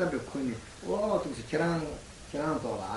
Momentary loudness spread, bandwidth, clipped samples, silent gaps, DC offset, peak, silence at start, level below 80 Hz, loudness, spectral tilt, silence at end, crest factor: 10 LU; 11.5 kHz; under 0.1%; none; under 0.1%; -16 dBFS; 0 s; -54 dBFS; -33 LUFS; -6 dB/octave; 0 s; 16 dB